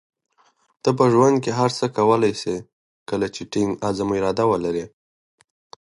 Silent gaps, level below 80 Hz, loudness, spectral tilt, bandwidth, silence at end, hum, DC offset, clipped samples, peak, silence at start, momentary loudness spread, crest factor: 2.73-3.06 s; -56 dBFS; -21 LUFS; -6 dB/octave; 11.5 kHz; 1.05 s; none; under 0.1%; under 0.1%; -2 dBFS; 0.85 s; 12 LU; 20 dB